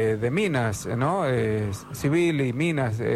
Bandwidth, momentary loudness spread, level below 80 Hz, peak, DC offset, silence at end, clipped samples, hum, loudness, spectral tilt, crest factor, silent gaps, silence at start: 15 kHz; 5 LU; -52 dBFS; -12 dBFS; under 0.1%; 0 s; under 0.1%; none; -25 LUFS; -6.5 dB/octave; 12 dB; none; 0 s